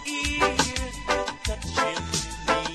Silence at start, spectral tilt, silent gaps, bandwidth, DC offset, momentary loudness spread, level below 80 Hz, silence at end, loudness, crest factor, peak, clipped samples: 0 s; -3 dB/octave; none; 13 kHz; under 0.1%; 7 LU; -38 dBFS; 0 s; -26 LUFS; 22 dB; -6 dBFS; under 0.1%